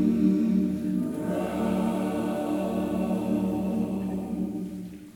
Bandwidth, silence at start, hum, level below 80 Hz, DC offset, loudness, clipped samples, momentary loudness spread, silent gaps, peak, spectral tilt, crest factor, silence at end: 17 kHz; 0 s; none; -52 dBFS; under 0.1%; -28 LUFS; under 0.1%; 8 LU; none; -12 dBFS; -8 dB/octave; 14 dB; 0.05 s